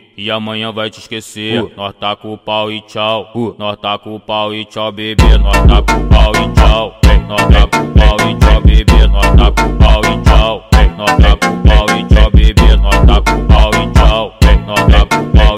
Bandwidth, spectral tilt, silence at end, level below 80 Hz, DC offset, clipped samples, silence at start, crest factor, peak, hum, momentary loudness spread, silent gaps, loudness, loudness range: 13.5 kHz; -6 dB/octave; 0 s; -10 dBFS; under 0.1%; 0.2%; 0.2 s; 8 dB; 0 dBFS; none; 10 LU; none; -11 LUFS; 8 LU